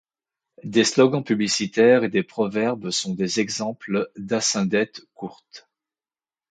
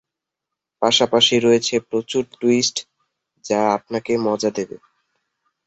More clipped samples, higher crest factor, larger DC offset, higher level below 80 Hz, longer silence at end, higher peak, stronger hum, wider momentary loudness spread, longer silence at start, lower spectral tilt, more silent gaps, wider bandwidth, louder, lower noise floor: neither; about the same, 20 dB vs 18 dB; neither; second, -66 dBFS vs -60 dBFS; about the same, 0.9 s vs 1 s; about the same, -4 dBFS vs -2 dBFS; neither; first, 13 LU vs 10 LU; second, 0.65 s vs 0.8 s; about the same, -4 dB/octave vs -3 dB/octave; neither; first, 9.4 kHz vs 8.4 kHz; second, -22 LUFS vs -19 LUFS; first, under -90 dBFS vs -84 dBFS